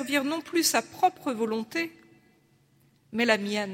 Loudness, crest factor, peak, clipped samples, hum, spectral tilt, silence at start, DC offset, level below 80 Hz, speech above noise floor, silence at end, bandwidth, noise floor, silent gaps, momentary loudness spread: -27 LUFS; 22 dB; -6 dBFS; under 0.1%; none; -2.5 dB/octave; 0 s; under 0.1%; -74 dBFS; 36 dB; 0 s; 16 kHz; -64 dBFS; none; 8 LU